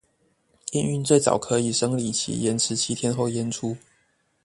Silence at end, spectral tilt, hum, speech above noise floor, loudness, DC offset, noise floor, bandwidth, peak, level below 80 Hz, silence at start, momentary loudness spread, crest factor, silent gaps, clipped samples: 0.7 s; -4.5 dB/octave; none; 44 dB; -24 LUFS; under 0.1%; -67 dBFS; 11.5 kHz; -4 dBFS; -60 dBFS; 0.65 s; 10 LU; 22 dB; none; under 0.1%